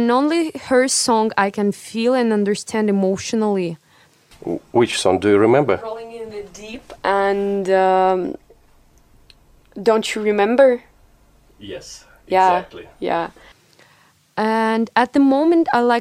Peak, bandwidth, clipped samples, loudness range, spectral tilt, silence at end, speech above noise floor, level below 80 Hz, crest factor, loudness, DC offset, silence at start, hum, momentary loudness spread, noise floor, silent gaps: 0 dBFS; 15.5 kHz; under 0.1%; 3 LU; -4.5 dB/octave; 0 s; 37 dB; -56 dBFS; 18 dB; -18 LUFS; under 0.1%; 0 s; none; 18 LU; -55 dBFS; none